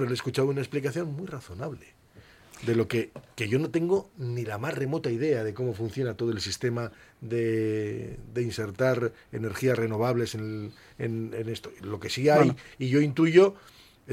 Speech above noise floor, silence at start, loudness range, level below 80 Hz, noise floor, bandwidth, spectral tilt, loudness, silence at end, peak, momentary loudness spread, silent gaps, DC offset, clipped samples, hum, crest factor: 25 dB; 0 s; 6 LU; -60 dBFS; -52 dBFS; 16 kHz; -6.5 dB/octave; -28 LUFS; 0 s; -6 dBFS; 15 LU; none; under 0.1%; under 0.1%; none; 22 dB